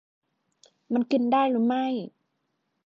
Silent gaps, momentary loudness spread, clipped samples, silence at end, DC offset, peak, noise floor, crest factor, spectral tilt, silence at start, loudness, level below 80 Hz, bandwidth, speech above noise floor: none; 10 LU; under 0.1%; 0.8 s; under 0.1%; -12 dBFS; -77 dBFS; 16 dB; -7 dB/octave; 0.9 s; -25 LUFS; -82 dBFS; 7.2 kHz; 53 dB